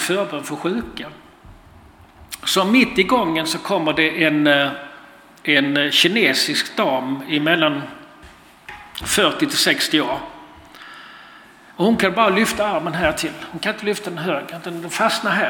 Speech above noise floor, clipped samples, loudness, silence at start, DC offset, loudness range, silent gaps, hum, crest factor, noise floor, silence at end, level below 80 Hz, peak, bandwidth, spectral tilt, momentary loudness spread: 27 dB; under 0.1%; -18 LUFS; 0 s; under 0.1%; 4 LU; none; none; 20 dB; -46 dBFS; 0 s; -52 dBFS; -2 dBFS; 18 kHz; -3.5 dB/octave; 19 LU